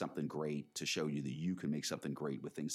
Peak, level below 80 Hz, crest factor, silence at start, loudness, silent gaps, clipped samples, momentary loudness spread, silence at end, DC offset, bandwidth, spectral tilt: -26 dBFS; -78 dBFS; 14 dB; 0 s; -40 LUFS; none; under 0.1%; 4 LU; 0 s; under 0.1%; 15.5 kHz; -4.5 dB/octave